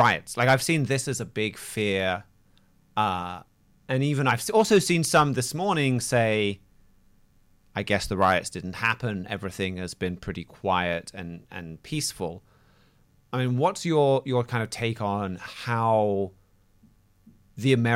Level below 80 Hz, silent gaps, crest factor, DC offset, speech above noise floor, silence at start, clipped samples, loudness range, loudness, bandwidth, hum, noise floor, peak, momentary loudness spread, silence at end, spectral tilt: -56 dBFS; none; 18 dB; under 0.1%; 36 dB; 0 s; under 0.1%; 7 LU; -26 LUFS; 16.5 kHz; none; -61 dBFS; -8 dBFS; 14 LU; 0 s; -5 dB/octave